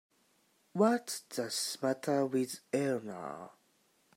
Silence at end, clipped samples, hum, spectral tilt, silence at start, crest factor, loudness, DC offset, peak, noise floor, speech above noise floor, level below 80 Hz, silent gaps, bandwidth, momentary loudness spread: 0.65 s; under 0.1%; none; -4.5 dB/octave; 0.75 s; 20 dB; -34 LUFS; under 0.1%; -16 dBFS; -72 dBFS; 38 dB; -86 dBFS; none; 16 kHz; 14 LU